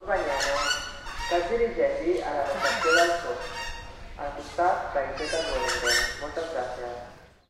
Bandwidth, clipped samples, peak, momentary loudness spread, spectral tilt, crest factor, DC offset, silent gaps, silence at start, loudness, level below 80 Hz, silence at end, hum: 16 kHz; under 0.1%; -10 dBFS; 14 LU; -2.5 dB/octave; 18 dB; under 0.1%; none; 0 s; -27 LUFS; -44 dBFS; 0.25 s; none